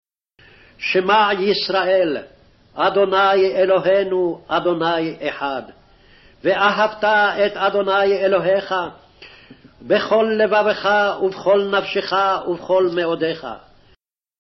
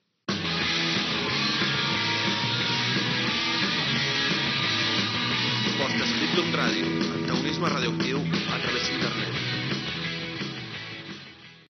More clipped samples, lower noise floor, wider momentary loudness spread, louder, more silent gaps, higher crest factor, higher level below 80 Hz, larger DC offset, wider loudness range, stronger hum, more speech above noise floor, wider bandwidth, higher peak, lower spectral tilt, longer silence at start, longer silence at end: neither; first, -58 dBFS vs -47 dBFS; about the same, 9 LU vs 8 LU; first, -18 LUFS vs -25 LUFS; neither; about the same, 14 dB vs 16 dB; about the same, -56 dBFS vs -58 dBFS; neither; about the same, 3 LU vs 4 LU; neither; first, 41 dB vs 21 dB; about the same, 6 kHz vs 6.6 kHz; first, -4 dBFS vs -12 dBFS; about the same, -2 dB/octave vs -2 dB/octave; first, 0.8 s vs 0.3 s; first, 0.85 s vs 0.1 s